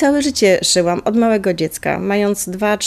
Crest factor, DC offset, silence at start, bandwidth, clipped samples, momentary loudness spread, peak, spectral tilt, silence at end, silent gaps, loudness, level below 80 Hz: 14 dB; under 0.1%; 0 s; 14 kHz; under 0.1%; 6 LU; -2 dBFS; -3.5 dB/octave; 0 s; none; -16 LUFS; -48 dBFS